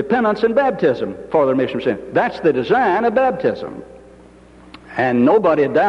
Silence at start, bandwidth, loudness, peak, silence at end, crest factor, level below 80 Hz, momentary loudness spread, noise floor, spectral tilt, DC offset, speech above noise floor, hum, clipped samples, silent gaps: 0 s; 7.4 kHz; -17 LUFS; -4 dBFS; 0 s; 14 dB; -52 dBFS; 9 LU; -44 dBFS; -7.5 dB/octave; under 0.1%; 28 dB; none; under 0.1%; none